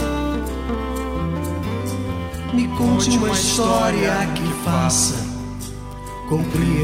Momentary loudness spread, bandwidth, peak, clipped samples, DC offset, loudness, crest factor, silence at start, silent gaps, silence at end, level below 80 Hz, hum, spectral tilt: 12 LU; 16 kHz; -6 dBFS; under 0.1%; under 0.1%; -20 LUFS; 14 dB; 0 s; none; 0 s; -32 dBFS; none; -4.5 dB/octave